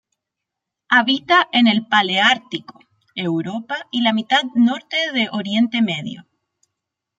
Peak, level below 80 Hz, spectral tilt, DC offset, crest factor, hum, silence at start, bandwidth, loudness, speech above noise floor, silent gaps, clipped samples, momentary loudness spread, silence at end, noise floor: -2 dBFS; -68 dBFS; -4.5 dB/octave; under 0.1%; 18 dB; none; 0.9 s; 7.8 kHz; -17 LUFS; 64 dB; none; under 0.1%; 12 LU; 1 s; -82 dBFS